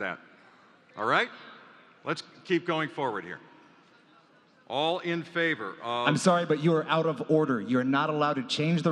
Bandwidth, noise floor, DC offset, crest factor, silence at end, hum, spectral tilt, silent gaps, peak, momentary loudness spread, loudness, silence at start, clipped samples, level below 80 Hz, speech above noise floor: 11.5 kHz; -60 dBFS; under 0.1%; 22 dB; 0 s; none; -5.5 dB/octave; none; -6 dBFS; 13 LU; -28 LUFS; 0 s; under 0.1%; -78 dBFS; 33 dB